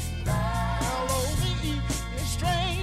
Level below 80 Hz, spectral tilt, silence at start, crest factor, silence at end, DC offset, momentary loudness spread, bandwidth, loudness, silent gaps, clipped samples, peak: -34 dBFS; -4.5 dB/octave; 0 s; 12 dB; 0 s; under 0.1%; 4 LU; 16 kHz; -28 LUFS; none; under 0.1%; -14 dBFS